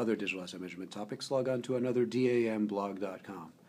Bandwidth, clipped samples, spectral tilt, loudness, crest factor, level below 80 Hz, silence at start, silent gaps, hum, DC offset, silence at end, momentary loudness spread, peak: 15 kHz; under 0.1%; -6 dB/octave; -34 LUFS; 14 dB; -82 dBFS; 0 s; none; none; under 0.1%; 0.2 s; 13 LU; -20 dBFS